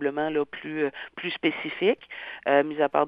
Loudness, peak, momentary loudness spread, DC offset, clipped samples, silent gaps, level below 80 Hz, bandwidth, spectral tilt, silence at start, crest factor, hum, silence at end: -27 LUFS; -6 dBFS; 9 LU; under 0.1%; under 0.1%; none; -70 dBFS; 5.2 kHz; -8 dB/octave; 0 s; 20 dB; none; 0 s